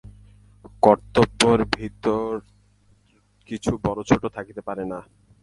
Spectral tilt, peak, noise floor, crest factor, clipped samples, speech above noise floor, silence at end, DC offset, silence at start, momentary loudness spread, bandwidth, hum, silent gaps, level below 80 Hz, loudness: -5 dB/octave; 0 dBFS; -61 dBFS; 24 dB; under 0.1%; 39 dB; 0.4 s; under 0.1%; 0.05 s; 15 LU; 11.5 kHz; none; none; -46 dBFS; -22 LUFS